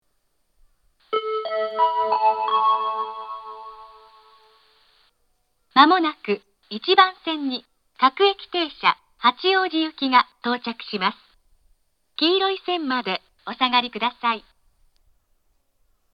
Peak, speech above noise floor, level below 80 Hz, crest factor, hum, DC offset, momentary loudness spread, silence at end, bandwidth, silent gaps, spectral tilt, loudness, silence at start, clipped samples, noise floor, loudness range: 0 dBFS; 50 dB; -68 dBFS; 24 dB; none; under 0.1%; 14 LU; 1.75 s; 6.4 kHz; none; -5.5 dB/octave; -21 LUFS; 1.1 s; under 0.1%; -71 dBFS; 5 LU